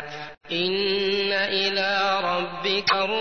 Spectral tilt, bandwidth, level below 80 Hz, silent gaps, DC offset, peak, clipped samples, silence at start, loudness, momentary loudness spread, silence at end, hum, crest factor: -4 dB/octave; 6.6 kHz; -62 dBFS; none; 0.4%; -8 dBFS; under 0.1%; 0 s; -23 LUFS; 5 LU; 0 s; none; 16 dB